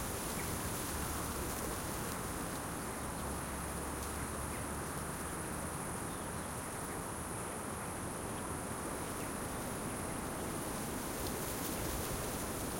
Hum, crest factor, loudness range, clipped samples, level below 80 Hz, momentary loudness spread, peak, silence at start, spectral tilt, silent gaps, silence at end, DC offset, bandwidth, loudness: none; 16 dB; 2 LU; under 0.1%; -52 dBFS; 3 LU; -24 dBFS; 0 s; -4 dB/octave; none; 0 s; under 0.1%; 16.5 kHz; -40 LUFS